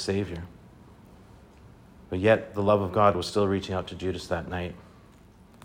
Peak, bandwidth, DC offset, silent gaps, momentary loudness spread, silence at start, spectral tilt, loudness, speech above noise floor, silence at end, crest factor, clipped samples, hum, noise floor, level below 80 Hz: -6 dBFS; 16 kHz; under 0.1%; none; 14 LU; 0 s; -6 dB/octave; -27 LUFS; 27 dB; 0.85 s; 22 dB; under 0.1%; none; -53 dBFS; -56 dBFS